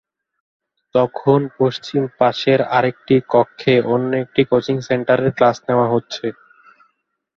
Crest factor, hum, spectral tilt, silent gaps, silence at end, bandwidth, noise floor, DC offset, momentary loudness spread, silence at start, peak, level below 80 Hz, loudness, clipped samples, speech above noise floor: 18 dB; none; -7 dB/octave; none; 1.05 s; 7.2 kHz; -67 dBFS; under 0.1%; 6 LU; 0.95 s; 0 dBFS; -58 dBFS; -17 LUFS; under 0.1%; 50 dB